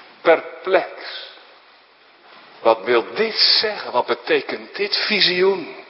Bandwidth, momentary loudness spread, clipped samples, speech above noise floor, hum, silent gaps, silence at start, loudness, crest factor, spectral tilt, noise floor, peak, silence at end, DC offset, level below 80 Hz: 5.8 kHz; 15 LU; under 0.1%; 32 dB; none; none; 0.25 s; -18 LUFS; 20 dB; -7 dB/octave; -51 dBFS; 0 dBFS; 0.05 s; under 0.1%; -74 dBFS